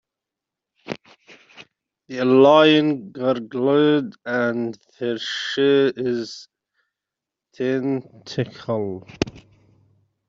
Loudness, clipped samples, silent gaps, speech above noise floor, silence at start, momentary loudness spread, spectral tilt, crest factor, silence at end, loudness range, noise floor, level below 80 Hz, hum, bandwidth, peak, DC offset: -20 LUFS; under 0.1%; none; 66 dB; 0.85 s; 17 LU; -6 dB/octave; 20 dB; 0.9 s; 10 LU; -86 dBFS; -58 dBFS; none; 7.6 kHz; -2 dBFS; under 0.1%